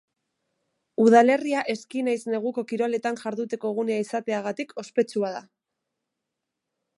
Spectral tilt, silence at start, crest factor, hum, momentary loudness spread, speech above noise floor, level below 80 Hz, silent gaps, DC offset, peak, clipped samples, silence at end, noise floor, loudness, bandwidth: -5.5 dB/octave; 1 s; 20 dB; none; 13 LU; 60 dB; -80 dBFS; none; under 0.1%; -6 dBFS; under 0.1%; 1.55 s; -84 dBFS; -25 LUFS; 11.5 kHz